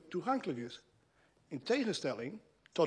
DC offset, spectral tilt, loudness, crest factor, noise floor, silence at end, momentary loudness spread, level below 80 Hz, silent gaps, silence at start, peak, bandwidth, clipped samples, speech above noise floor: under 0.1%; -5 dB/octave; -38 LUFS; 20 dB; -71 dBFS; 0 s; 14 LU; -80 dBFS; none; 0.05 s; -18 dBFS; 11 kHz; under 0.1%; 34 dB